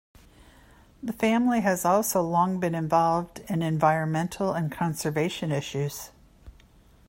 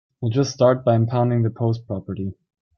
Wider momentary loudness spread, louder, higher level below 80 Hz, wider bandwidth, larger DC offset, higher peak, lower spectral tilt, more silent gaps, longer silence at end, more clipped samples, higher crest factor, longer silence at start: second, 9 LU vs 12 LU; second, -26 LUFS vs -21 LUFS; about the same, -56 dBFS vs -58 dBFS; first, 16.5 kHz vs 6.8 kHz; neither; second, -8 dBFS vs -4 dBFS; second, -5.5 dB/octave vs -7.5 dB/octave; neither; first, 0.6 s vs 0.45 s; neither; about the same, 20 dB vs 16 dB; first, 1 s vs 0.2 s